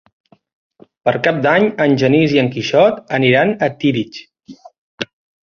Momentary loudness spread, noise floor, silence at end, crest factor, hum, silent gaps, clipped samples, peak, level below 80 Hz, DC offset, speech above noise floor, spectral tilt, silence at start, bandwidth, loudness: 15 LU; -40 dBFS; 0.4 s; 16 dB; none; 4.78-4.98 s; under 0.1%; -2 dBFS; -54 dBFS; under 0.1%; 26 dB; -6.5 dB/octave; 1.05 s; 7 kHz; -14 LUFS